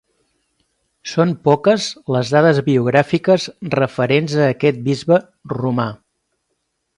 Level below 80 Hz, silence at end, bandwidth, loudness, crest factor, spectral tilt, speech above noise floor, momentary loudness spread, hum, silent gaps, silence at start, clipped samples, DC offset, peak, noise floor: -58 dBFS; 1.05 s; 11.5 kHz; -17 LUFS; 18 dB; -6.5 dB/octave; 56 dB; 8 LU; none; none; 1.05 s; under 0.1%; under 0.1%; 0 dBFS; -71 dBFS